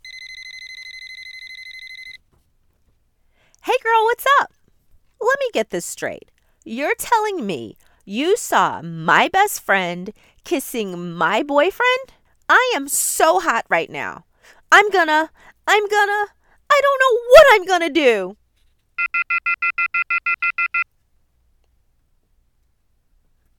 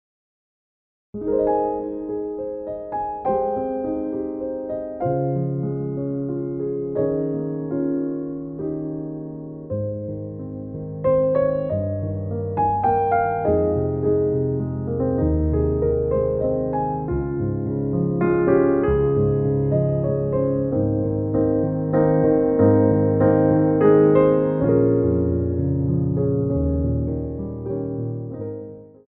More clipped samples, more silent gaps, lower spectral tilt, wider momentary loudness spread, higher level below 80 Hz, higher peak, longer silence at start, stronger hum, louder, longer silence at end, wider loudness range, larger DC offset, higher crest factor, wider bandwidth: neither; neither; second, -2.5 dB/octave vs -14 dB/octave; first, 20 LU vs 12 LU; second, -54 dBFS vs -38 dBFS; first, 0 dBFS vs -4 dBFS; second, 0.05 s vs 1.15 s; neither; first, -17 LUFS vs -22 LUFS; first, 2.75 s vs 0.25 s; about the same, 9 LU vs 9 LU; neither; about the same, 20 dB vs 16 dB; first, 19 kHz vs 3.4 kHz